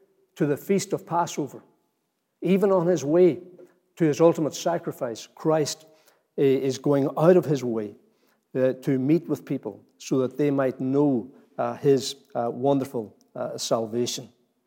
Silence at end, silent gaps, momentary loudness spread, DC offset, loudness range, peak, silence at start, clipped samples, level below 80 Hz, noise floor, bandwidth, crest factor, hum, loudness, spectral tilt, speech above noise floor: 0.4 s; none; 14 LU; under 0.1%; 3 LU; -4 dBFS; 0.35 s; under 0.1%; -84 dBFS; -76 dBFS; 17 kHz; 20 dB; none; -24 LUFS; -6 dB/octave; 52 dB